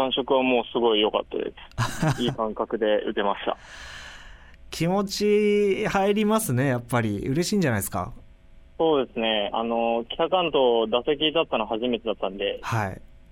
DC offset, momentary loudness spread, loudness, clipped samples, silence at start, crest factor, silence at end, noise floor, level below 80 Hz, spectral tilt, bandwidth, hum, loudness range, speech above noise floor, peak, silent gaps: under 0.1%; 11 LU; -24 LUFS; under 0.1%; 0 s; 16 dB; 0.3 s; -49 dBFS; -48 dBFS; -5 dB/octave; 16 kHz; none; 4 LU; 25 dB; -8 dBFS; none